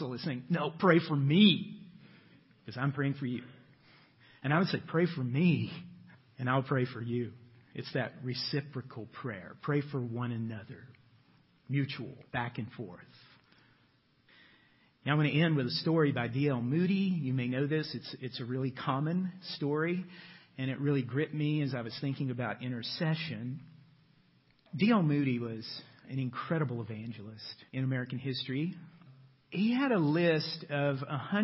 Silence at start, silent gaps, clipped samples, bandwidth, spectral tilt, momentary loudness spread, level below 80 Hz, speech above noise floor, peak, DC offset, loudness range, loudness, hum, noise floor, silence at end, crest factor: 0 s; none; under 0.1%; 5.8 kHz; -10 dB/octave; 16 LU; -72 dBFS; 37 dB; -10 dBFS; under 0.1%; 8 LU; -33 LUFS; none; -69 dBFS; 0 s; 24 dB